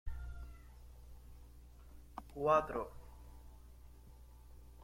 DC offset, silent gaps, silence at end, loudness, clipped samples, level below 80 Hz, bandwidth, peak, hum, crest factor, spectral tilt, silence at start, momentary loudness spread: under 0.1%; none; 0 s; -38 LUFS; under 0.1%; -54 dBFS; 16.5 kHz; -18 dBFS; 60 Hz at -55 dBFS; 24 dB; -6.5 dB/octave; 0.05 s; 27 LU